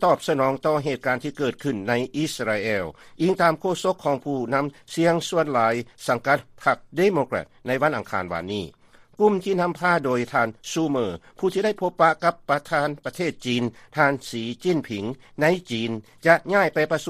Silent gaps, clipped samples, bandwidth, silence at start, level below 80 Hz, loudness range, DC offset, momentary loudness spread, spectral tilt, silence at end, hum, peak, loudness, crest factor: none; under 0.1%; 15 kHz; 0 s; -60 dBFS; 2 LU; under 0.1%; 8 LU; -5.5 dB/octave; 0 s; none; -4 dBFS; -23 LUFS; 20 dB